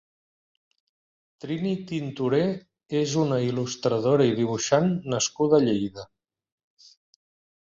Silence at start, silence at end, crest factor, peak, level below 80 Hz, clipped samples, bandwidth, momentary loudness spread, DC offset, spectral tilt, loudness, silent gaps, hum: 1.45 s; 1.6 s; 20 dB; -6 dBFS; -64 dBFS; under 0.1%; 7.8 kHz; 11 LU; under 0.1%; -5.5 dB/octave; -25 LUFS; none; none